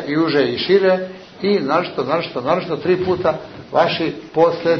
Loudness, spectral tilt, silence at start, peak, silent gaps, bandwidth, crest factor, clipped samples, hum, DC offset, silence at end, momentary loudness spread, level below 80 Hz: -18 LUFS; -7 dB/octave; 0 s; -2 dBFS; none; 6.4 kHz; 16 dB; under 0.1%; none; under 0.1%; 0 s; 7 LU; -54 dBFS